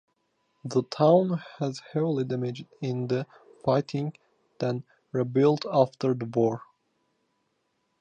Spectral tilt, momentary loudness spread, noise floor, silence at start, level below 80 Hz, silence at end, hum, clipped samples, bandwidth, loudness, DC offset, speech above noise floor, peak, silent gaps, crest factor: -7.5 dB/octave; 12 LU; -75 dBFS; 0.65 s; -72 dBFS; 1.4 s; none; under 0.1%; 9.2 kHz; -27 LUFS; under 0.1%; 49 dB; -8 dBFS; none; 20 dB